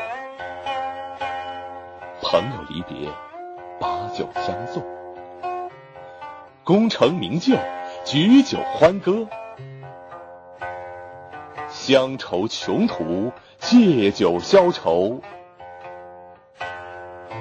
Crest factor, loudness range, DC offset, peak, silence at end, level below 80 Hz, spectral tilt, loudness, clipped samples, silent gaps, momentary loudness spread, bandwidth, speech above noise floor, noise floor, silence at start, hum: 18 dB; 10 LU; under 0.1%; -4 dBFS; 0 s; -58 dBFS; -6 dB/octave; -21 LUFS; under 0.1%; none; 23 LU; 8.6 kHz; 25 dB; -44 dBFS; 0 s; none